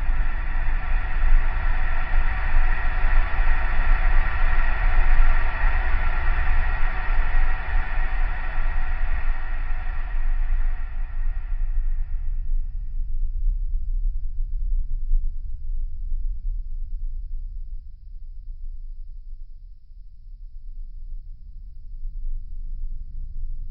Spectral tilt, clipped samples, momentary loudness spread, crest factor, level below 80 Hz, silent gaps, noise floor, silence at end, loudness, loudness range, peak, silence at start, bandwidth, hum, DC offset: -9.5 dB/octave; under 0.1%; 18 LU; 16 dB; -20 dBFS; none; -40 dBFS; 0 s; -29 LUFS; 17 LU; -4 dBFS; 0 s; 3.7 kHz; none; under 0.1%